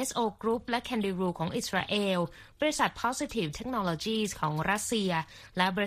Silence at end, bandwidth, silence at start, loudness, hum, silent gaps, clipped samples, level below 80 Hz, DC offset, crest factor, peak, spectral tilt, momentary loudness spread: 0 s; 15.5 kHz; 0 s; -31 LUFS; none; none; under 0.1%; -56 dBFS; under 0.1%; 22 dB; -10 dBFS; -4 dB/octave; 4 LU